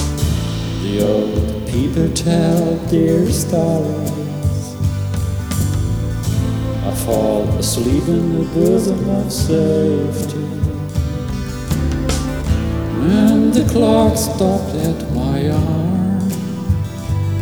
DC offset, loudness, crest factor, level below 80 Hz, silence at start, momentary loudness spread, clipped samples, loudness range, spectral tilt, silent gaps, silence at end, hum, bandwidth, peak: 0.3%; -17 LUFS; 14 dB; -28 dBFS; 0 s; 8 LU; under 0.1%; 4 LU; -6.5 dB/octave; none; 0 s; none; over 20 kHz; -2 dBFS